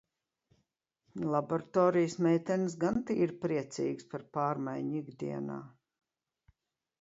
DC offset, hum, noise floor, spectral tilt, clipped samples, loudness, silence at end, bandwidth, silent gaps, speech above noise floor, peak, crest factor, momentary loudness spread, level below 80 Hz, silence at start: under 0.1%; none; -83 dBFS; -7 dB/octave; under 0.1%; -33 LUFS; 1.3 s; 8 kHz; none; 51 dB; -14 dBFS; 20 dB; 11 LU; -70 dBFS; 1.15 s